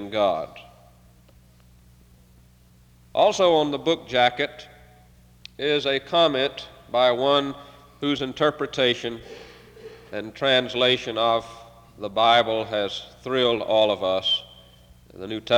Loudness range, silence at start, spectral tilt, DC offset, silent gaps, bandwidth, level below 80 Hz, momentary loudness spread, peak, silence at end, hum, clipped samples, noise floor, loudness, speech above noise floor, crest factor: 3 LU; 0 s; -4 dB/octave; under 0.1%; none; 18 kHz; -58 dBFS; 16 LU; -6 dBFS; 0 s; 60 Hz at -60 dBFS; under 0.1%; -54 dBFS; -22 LUFS; 32 dB; 18 dB